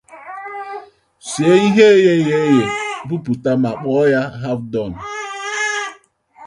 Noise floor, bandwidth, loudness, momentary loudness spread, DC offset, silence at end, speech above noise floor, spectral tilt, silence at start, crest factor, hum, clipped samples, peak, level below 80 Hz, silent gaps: -47 dBFS; 11.5 kHz; -16 LUFS; 19 LU; under 0.1%; 0 s; 32 dB; -5.5 dB/octave; 0.1 s; 16 dB; none; under 0.1%; 0 dBFS; -54 dBFS; none